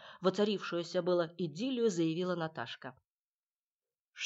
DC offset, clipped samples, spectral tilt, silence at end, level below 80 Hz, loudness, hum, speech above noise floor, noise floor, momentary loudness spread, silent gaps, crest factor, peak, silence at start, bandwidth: under 0.1%; under 0.1%; -5.5 dB/octave; 0 s; -88 dBFS; -35 LUFS; none; over 56 dB; under -90 dBFS; 11 LU; 3.07-3.80 s, 4.01-4.13 s; 18 dB; -18 dBFS; 0 s; 8.2 kHz